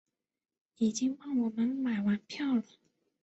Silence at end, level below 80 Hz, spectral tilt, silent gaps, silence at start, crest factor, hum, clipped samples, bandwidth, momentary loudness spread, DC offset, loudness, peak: 0.6 s; -74 dBFS; -5 dB/octave; none; 0.8 s; 14 dB; none; under 0.1%; 8.2 kHz; 3 LU; under 0.1%; -32 LUFS; -18 dBFS